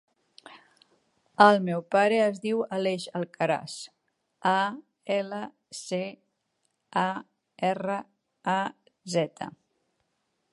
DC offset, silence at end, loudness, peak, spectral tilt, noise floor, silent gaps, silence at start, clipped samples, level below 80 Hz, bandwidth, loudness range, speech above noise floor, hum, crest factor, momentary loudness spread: under 0.1%; 1.05 s; -27 LUFS; -4 dBFS; -5 dB/octave; -77 dBFS; none; 0.5 s; under 0.1%; -78 dBFS; 11.5 kHz; 7 LU; 50 dB; none; 24 dB; 19 LU